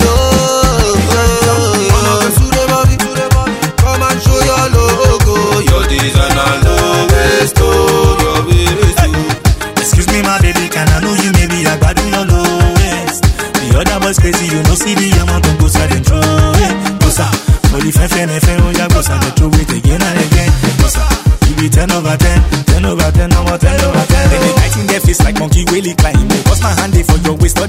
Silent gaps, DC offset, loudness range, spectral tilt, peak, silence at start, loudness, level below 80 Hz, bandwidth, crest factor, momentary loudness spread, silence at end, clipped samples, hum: none; under 0.1%; 1 LU; -5 dB/octave; 0 dBFS; 0 s; -10 LUFS; -14 dBFS; 16.5 kHz; 10 dB; 3 LU; 0 s; 0.4%; none